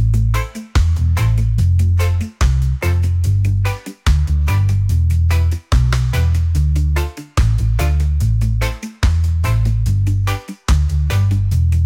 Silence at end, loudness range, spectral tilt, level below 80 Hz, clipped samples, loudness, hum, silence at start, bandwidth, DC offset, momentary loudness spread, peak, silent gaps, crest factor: 0 s; 1 LU; -6 dB/octave; -20 dBFS; under 0.1%; -17 LUFS; none; 0 s; 16.5 kHz; under 0.1%; 4 LU; -4 dBFS; none; 10 dB